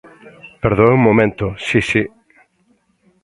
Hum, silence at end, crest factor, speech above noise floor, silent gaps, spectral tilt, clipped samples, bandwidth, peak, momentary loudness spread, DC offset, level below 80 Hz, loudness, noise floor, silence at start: none; 1.15 s; 18 dB; 46 dB; none; -7 dB/octave; under 0.1%; 11 kHz; 0 dBFS; 10 LU; under 0.1%; -42 dBFS; -15 LUFS; -60 dBFS; 0.25 s